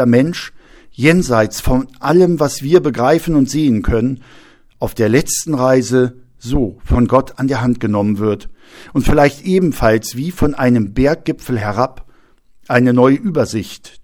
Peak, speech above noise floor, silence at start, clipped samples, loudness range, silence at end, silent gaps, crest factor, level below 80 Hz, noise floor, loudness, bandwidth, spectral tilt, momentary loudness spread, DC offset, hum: 0 dBFS; 33 dB; 0 s; under 0.1%; 3 LU; 0.05 s; none; 14 dB; -30 dBFS; -47 dBFS; -15 LUFS; 18.5 kHz; -6 dB/octave; 9 LU; under 0.1%; none